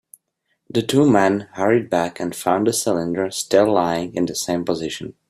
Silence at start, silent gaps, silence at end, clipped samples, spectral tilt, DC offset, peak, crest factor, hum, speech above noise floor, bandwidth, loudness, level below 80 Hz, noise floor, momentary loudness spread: 0.75 s; none; 0.2 s; under 0.1%; -4.5 dB/octave; under 0.1%; -2 dBFS; 18 dB; none; 53 dB; 15.5 kHz; -20 LUFS; -58 dBFS; -72 dBFS; 9 LU